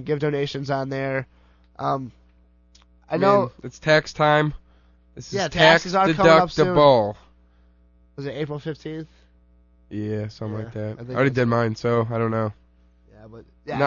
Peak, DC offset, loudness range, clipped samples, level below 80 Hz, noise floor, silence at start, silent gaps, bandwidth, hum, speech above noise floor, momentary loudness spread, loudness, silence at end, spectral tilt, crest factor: -2 dBFS; under 0.1%; 13 LU; under 0.1%; -50 dBFS; -56 dBFS; 0 s; none; 7.4 kHz; 60 Hz at -55 dBFS; 35 dB; 17 LU; -21 LUFS; 0 s; -6 dB/octave; 20 dB